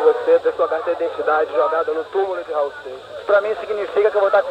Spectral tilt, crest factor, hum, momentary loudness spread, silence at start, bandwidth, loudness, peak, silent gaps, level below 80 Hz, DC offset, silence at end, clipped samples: -4.5 dB/octave; 16 dB; none; 7 LU; 0 s; 8.8 kHz; -19 LUFS; -4 dBFS; none; -62 dBFS; under 0.1%; 0 s; under 0.1%